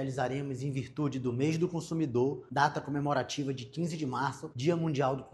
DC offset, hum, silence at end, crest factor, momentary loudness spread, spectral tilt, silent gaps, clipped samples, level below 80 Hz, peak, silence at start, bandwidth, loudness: under 0.1%; none; 0.05 s; 20 dB; 6 LU; -6.5 dB/octave; none; under 0.1%; -66 dBFS; -12 dBFS; 0 s; 12 kHz; -32 LUFS